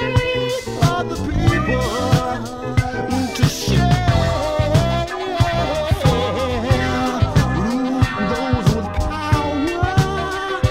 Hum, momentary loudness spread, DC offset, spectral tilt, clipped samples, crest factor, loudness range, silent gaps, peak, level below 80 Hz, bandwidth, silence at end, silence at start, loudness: none; 5 LU; under 0.1%; -6 dB/octave; under 0.1%; 14 dB; 1 LU; none; -4 dBFS; -28 dBFS; 16 kHz; 0 s; 0 s; -19 LUFS